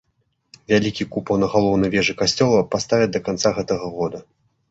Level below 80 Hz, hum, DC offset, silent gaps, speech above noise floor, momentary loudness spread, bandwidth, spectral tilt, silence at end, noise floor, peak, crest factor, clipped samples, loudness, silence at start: -48 dBFS; none; under 0.1%; none; 49 dB; 9 LU; 8.2 kHz; -5 dB/octave; 0.5 s; -69 dBFS; -2 dBFS; 18 dB; under 0.1%; -20 LUFS; 0.7 s